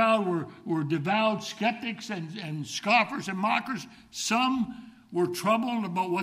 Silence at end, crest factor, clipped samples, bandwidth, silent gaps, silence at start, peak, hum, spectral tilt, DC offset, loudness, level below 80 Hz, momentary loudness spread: 0 s; 18 dB; under 0.1%; 15.5 kHz; none; 0 s; -10 dBFS; none; -4.5 dB/octave; under 0.1%; -28 LUFS; -70 dBFS; 12 LU